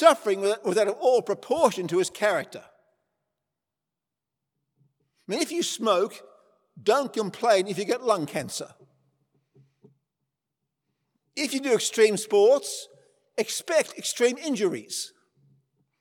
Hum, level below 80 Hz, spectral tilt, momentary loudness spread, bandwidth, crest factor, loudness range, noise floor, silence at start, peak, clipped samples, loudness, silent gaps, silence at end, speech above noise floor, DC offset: none; -78 dBFS; -3 dB/octave; 13 LU; 19 kHz; 24 dB; 10 LU; -88 dBFS; 0 s; -2 dBFS; under 0.1%; -25 LUFS; none; 0.95 s; 63 dB; under 0.1%